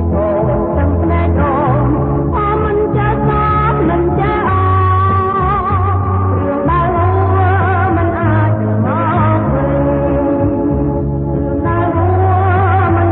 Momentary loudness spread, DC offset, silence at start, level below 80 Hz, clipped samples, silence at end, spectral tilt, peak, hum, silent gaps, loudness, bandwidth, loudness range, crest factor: 3 LU; under 0.1%; 0 s; -24 dBFS; under 0.1%; 0 s; -13 dB/octave; -2 dBFS; none; none; -13 LUFS; 4 kHz; 1 LU; 10 dB